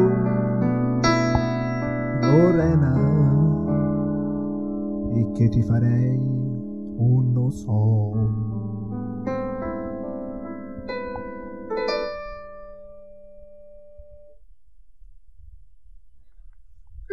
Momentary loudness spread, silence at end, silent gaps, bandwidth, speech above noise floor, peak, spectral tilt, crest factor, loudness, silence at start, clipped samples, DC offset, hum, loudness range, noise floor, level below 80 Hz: 14 LU; 0.05 s; none; 7.2 kHz; 35 dB; -4 dBFS; -8.5 dB/octave; 18 dB; -23 LUFS; 0 s; under 0.1%; 0.6%; none; 12 LU; -54 dBFS; -44 dBFS